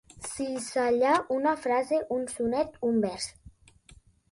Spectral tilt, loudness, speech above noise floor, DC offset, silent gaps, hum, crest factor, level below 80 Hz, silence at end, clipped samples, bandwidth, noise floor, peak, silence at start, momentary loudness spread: -4 dB/octave; -28 LUFS; 30 dB; under 0.1%; none; none; 16 dB; -60 dBFS; 0.85 s; under 0.1%; 11.5 kHz; -57 dBFS; -12 dBFS; 0.15 s; 10 LU